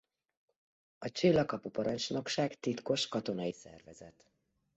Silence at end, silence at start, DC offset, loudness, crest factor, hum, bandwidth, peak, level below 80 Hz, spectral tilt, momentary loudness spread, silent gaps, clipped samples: 0.65 s; 1 s; under 0.1%; -34 LUFS; 20 dB; none; 8 kHz; -16 dBFS; -70 dBFS; -4.5 dB/octave; 20 LU; none; under 0.1%